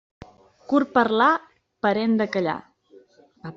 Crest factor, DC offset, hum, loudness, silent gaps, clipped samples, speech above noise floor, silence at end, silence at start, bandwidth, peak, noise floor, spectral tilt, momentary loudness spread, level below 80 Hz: 20 dB; under 0.1%; none; -22 LUFS; none; under 0.1%; 33 dB; 0.05 s; 0.7 s; 7.4 kHz; -4 dBFS; -54 dBFS; -6.5 dB/octave; 9 LU; -64 dBFS